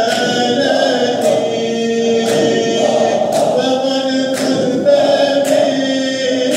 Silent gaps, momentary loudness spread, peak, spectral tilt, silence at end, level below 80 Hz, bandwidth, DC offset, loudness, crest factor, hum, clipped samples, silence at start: none; 4 LU; -2 dBFS; -4 dB/octave; 0 s; -66 dBFS; 16 kHz; under 0.1%; -14 LUFS; 12 dB; none; under 0.1%; 0 s